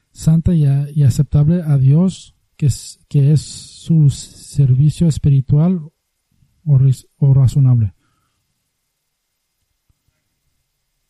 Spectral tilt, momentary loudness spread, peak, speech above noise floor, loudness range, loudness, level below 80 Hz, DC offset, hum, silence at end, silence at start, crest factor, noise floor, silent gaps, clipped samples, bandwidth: -8 dB/octave; 11 LU; -2 dBFS; 58 dB; 4 LU; -15 LUFS; -38 dBFS; under 0.1%; none; 3.2 s; 0.2 s; 12 dB; -71 dBFS; none; under 0.1%; 12 kHz